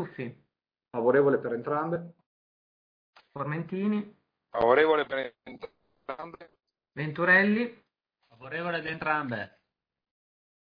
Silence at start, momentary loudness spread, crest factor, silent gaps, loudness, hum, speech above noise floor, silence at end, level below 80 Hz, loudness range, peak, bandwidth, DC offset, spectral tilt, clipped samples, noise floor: 0 s; 23 LU; 20 dB; 2.26-3.13 s; -27 LUFS; none; 40 dB; 1.25 s; -68 dBFS; 5 LU; -10 dBFS; 5.2 kHz; under 0.1%; -9 dB/octave; under 0.1%; -68 dBFS